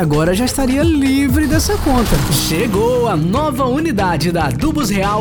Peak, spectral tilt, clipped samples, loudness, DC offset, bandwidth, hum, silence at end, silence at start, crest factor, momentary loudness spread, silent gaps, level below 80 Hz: -2 dBFS; -5.5 dB/octave; under 0.1%; -15 LUFS; under 0.1%; over 20 kHz; none; 0 s; 0 s; 14 dB; 3 LU; none; -24 dBFS